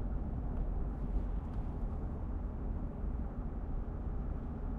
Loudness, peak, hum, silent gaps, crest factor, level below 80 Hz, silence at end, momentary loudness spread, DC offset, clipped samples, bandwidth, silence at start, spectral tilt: -41 LUFS; -24 dBFS; none; none; 14 dB; -38 dBFS; 0 s; 2 LU; under 0.1%; under 0.1%; 3.1 kHz; 0 s; -11 dB/octave